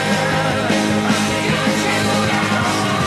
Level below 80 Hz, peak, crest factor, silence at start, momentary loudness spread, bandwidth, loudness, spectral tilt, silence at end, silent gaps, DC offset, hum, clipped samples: -44 dBFS; -4 dBFS; 14 dB; 0 s; 1 LU; 13 kHz; -17 LUFS; -4 dB/octave; 0 s; none; under 0.1%; none; under 0.1%